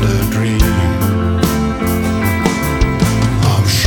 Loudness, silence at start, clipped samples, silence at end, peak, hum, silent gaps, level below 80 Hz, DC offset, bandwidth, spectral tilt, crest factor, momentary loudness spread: -14 LUFS; 0 s; under 0.1%; 0 s; 0 dBFS; none; none; -22 dBFS; under 0.1%; 19 kHz; -5.5 dB/octave; 14 dB; 2 LU